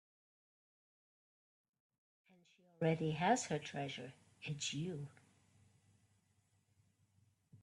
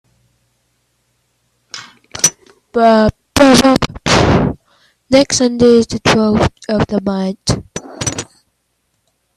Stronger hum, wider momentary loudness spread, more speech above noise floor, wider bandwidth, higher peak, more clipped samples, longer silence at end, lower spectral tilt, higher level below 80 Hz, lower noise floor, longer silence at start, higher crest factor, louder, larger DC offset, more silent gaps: neither; second, 15 LU vs 21 LU; second, 38 dB vs 54 dB; second, 11.5 kHz vs 15.5 kHz; second, -20 dBFS vs 0 dBFS; neither; second, 0.05 s vs 1.15 s; about the same, -4.5 dB/octave vs -4 dB/octave; second, -82 dBFS vs -36 dBFS; first, -78 dBFS vs -65 dBFS; first, 2.8 s vs 1.75 s; first, 24 dB vs 14 dB; second, -40 LUFS vs -13 LUFS; neither; neither